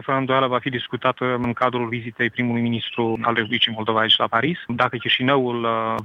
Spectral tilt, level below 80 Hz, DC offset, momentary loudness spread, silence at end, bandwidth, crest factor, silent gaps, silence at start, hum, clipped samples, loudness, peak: -7 dB/octave; -58 dBFS; under 0.1%; 7 LU; 0 s; 6.8 kHz; 18 dB; none; 0 s; none; under 0.1%; -21 LUFS; -2 dBFS